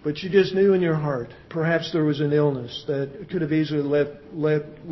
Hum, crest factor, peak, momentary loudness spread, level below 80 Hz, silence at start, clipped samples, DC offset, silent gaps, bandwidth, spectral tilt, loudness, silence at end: none; 18 dB; -6 dBFS; 9 LU; -56 dBFS; 0.05 s; under 0.1%; under 0.1%; none; 6 kHz; -8 dB/octave; -23 LUFS; 0 s